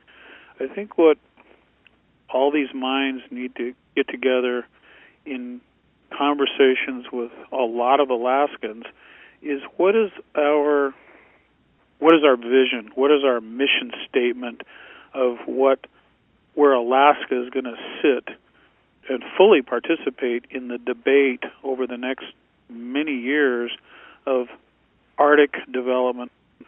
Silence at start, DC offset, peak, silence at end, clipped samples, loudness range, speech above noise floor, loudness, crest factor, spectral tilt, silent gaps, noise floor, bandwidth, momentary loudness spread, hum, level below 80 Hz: 0.6 s; under 0.1%; 0 dBFS; 0.05 s; under 0.1%; 6 LU; 41 dB; -21 LUFS; 22 dB; -7.5 dB/octave; none; -62 dBFS; 3.6 kHz; 16 LU; none; -70 dBFS